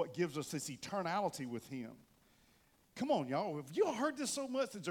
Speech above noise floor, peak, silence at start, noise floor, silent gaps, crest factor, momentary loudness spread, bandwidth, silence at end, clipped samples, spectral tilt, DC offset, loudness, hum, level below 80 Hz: 32 dB; -22 dBFS; 0 s; -71 dBFS; none; 18 dB; 10 LU; 17.5 kHz; 0 s; under 0.1%; -4.5 dB/octave; under 0.1%; -39 LUFS; none; -78 dBFS